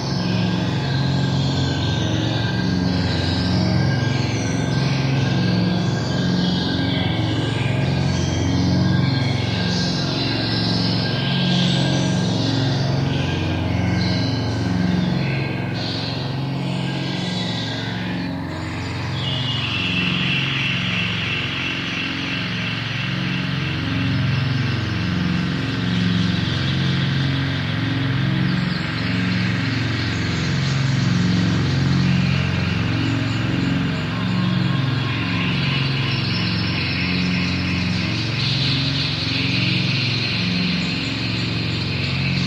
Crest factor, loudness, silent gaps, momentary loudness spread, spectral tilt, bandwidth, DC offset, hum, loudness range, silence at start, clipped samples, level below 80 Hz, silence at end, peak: 14 dB; -20 LUFS; none; 4 LU; -5.5 dB/octave; 9.2 kHz; under 0.1%; none; 3 LU; 0 s; under 0.1%; -42 dBFS; 0 s; -6 dBFS